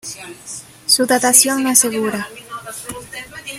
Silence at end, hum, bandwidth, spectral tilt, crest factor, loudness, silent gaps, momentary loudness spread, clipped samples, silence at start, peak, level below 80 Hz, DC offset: 0 s; none; 16.5 kHz; -1 dB/octave; 18 dB; -13 LUFS; none; 20 LU; under 0.1%; 0.05 s; 0 dBFS; -56 dBFS; under 0.1%